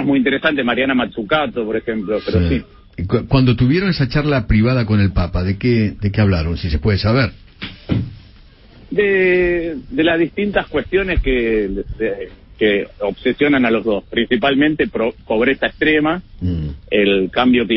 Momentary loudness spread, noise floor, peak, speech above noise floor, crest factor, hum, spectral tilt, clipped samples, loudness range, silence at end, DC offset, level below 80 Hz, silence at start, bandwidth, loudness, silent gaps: 8 LU; -44 dBFS; -2 dBFS; 27 dB; 16 dB; none; -11 dB/octave; under 0.1%; 2 LU; 0 s; under 0.1%; -30 dBFS; 0 s; 5.8 kHz; -17 LUFS; none